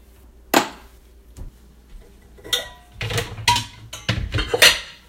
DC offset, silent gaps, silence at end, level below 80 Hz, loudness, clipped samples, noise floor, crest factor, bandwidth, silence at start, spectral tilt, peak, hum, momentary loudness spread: under 0.1%; none; 0.15 s; -38 dBFS; -19 LUFS; under 0.1%; -47 dBFS; 24 dB; 16.5 kHz; 0.5 s; -2 dB/octave; 0 dBFS; none; 18 LU